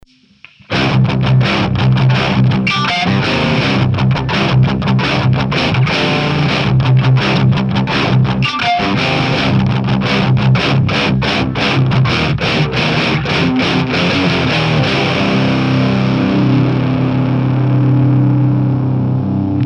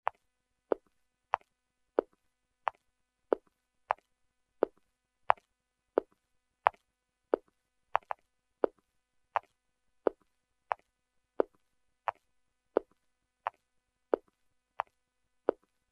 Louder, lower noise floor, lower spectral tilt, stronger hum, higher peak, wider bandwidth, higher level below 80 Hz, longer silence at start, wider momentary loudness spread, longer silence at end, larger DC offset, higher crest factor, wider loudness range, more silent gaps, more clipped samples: first, -13 LUFS vs -37 LUFS; second, -44 dBFS vs -83 dBFS; first, -7 dB/octave vs -5.5 dB/octave; neither; first, -2 dBFS vs -6 dBFS; second, 7.2 kHz vs 9.2 kHz; first, -34 dBFS vs -76 dBFS; second, 0.7 s vs 2 s; second, 2 LU vs 9 LU; second, 0 s vs 2.4 s; neither; second, 12 dB vs 32 dB; second, 1 LU vs 5 LU; neither; neither